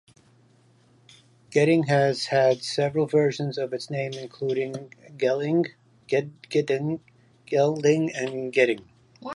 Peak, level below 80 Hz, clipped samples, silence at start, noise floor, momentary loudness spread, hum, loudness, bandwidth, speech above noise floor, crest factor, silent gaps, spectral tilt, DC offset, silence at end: -6 dBFS; -70 dBFS; under 0.1%; 1.5 s; -59 dBFS; 11 LU; none; -25 LUFS; 11.5 kHz; 35 dB; 20 dB; none; -6 dB/octave; under 0.1%; 0 s